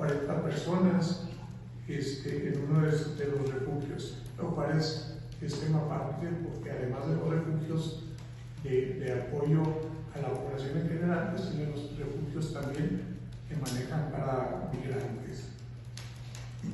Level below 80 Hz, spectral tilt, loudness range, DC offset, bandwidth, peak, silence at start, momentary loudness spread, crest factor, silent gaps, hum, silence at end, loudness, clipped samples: -54 dBFS; -7 dB/octave; 4 LU; under 0.1%; 12 kHz; -16 dBFS; 0 s; 14 LU; 18 dB; none; none; 0 s; -34 LUFS; under 0.1%